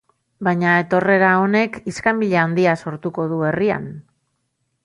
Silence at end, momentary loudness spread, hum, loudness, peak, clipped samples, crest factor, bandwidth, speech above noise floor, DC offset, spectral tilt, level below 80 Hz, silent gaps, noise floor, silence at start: 0.85 s; 10 LU; none; -18 LUFS; -2 dBFS; under 0.1%; 16 dB; 11 kHz; 53 dB; under 0.1%; -7 dB/octave; -58 dBFS; none; -71 dBFS; 0.4 s